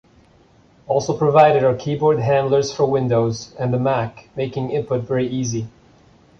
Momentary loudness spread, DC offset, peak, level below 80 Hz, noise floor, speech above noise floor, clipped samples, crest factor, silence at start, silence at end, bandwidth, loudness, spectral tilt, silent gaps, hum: 12 LU; under 0.1%; -2 dBFS; -52 dBFS; -52 dBFS; 34 dB; under 0.1%; 18 dB; 0.9 s; 0.7 s; 7.4 kHz; -19 LUFS; -6.5 dB/octave; none; none